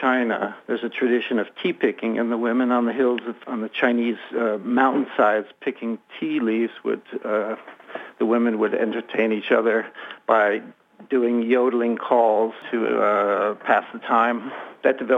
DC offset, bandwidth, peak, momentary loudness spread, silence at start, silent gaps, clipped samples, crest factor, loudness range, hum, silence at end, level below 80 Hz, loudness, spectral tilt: under 0.1%; 4 kHz; -4 dBFS; 10 LU; 0 s; none; under 0.1%; 18 dB; 4 LU; none; 0 s; -80 dBFS; -22 LUFS; -7 dB/octave